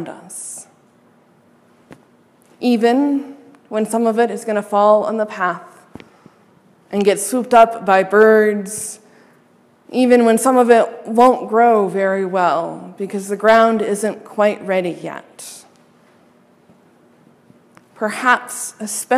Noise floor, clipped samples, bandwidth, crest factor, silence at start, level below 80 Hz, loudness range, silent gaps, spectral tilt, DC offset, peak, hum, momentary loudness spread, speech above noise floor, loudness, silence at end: -53 dBFS; under 0.1%; 15.5 kHz; 18 dB; 0 s; -64 dBFS; 9 LU; none; -4.5 dB/octave; under 0.1%; 0 dBFS; none; 17 LU; 37 dB; -16 LUFS; 0 s